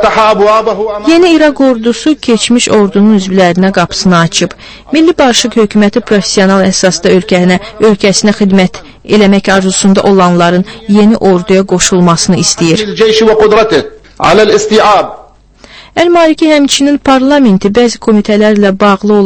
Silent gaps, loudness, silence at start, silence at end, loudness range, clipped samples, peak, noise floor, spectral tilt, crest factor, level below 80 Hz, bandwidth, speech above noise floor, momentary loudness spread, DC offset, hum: none; -7 LUFS; 0 s; 0 s; 1 LU; 2%; 0 dBFS; -37 dBFS; -4.5 dB/octave; 6 dB; -36 dBFS; 11 kHz; 31 dB; 4 LU; under 0.1%; none